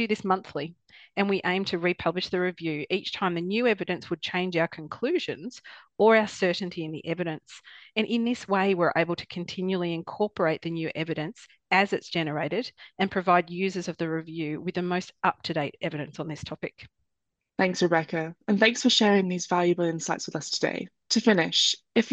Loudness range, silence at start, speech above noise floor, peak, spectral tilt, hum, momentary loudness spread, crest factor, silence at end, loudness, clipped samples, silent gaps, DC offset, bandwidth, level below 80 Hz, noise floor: 5 LU; 0 s; 56 dB; -6 dBFS; -4.5 dB/octave; none; 14 LU; 20 dB; 0 s; -27 LUFS; under 0.1%; none; under 0.1%; 8.8 kHz; -66 dBFS; -83 dBFS